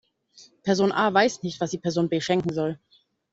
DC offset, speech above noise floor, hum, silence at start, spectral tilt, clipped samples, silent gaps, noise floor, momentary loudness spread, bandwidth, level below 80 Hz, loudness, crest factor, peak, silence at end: under 0.1%; 31 dB; none; 0.4 s; -5 dB/octave; under 0.1%; none; -55 dBFS; 10 LU; 8 kHz; -64 dBFS; -24 LUFS; 22 dB; -4 dBFS; 0.55 s